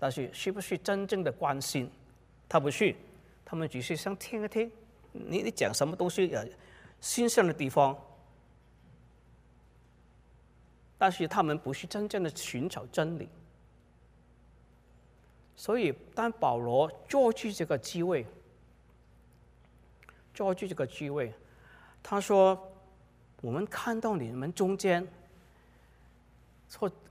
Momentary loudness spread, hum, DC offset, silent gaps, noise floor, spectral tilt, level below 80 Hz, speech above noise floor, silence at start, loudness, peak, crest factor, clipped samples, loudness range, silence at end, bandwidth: 13 LU; none; under 0.1%; none; -61 dBFS; -5 dB/octave; -64 dBFS; 30 dB; 0 s; -31 LUFS; -10 dBFS; 22 dB; under 0.1%; 7 LU; 0.2 s; 15.5 kHz